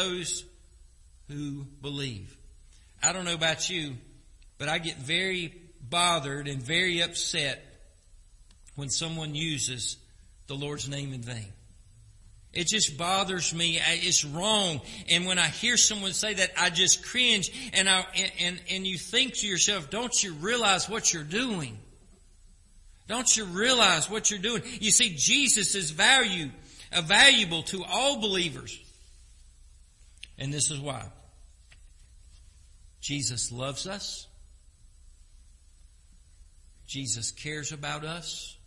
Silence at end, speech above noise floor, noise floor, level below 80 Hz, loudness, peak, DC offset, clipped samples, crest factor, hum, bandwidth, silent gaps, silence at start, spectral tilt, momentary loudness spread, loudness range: 0.1 s; 28 dB; -56 dBFS; -54 dBFS; -25 LUFS; -4 dBFS; under 0.1%; under 0.1%; 26 dB; none; 12 kHz; none; 0 s; -1.5 dB/octave; 16 LU; 13 LU